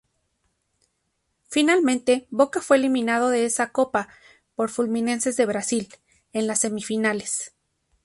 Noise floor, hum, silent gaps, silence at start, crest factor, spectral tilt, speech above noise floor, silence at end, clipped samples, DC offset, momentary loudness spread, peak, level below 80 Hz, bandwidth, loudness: -74 dBFS; none; none; 1.5 s; 18 dB; -3 dB/octave; 52 dB; 0.55 s; under 0.1%; under 0.1%; 9 LU; -6 dBFS; -66 dBFS; 11.5 kHz; -23 LUFS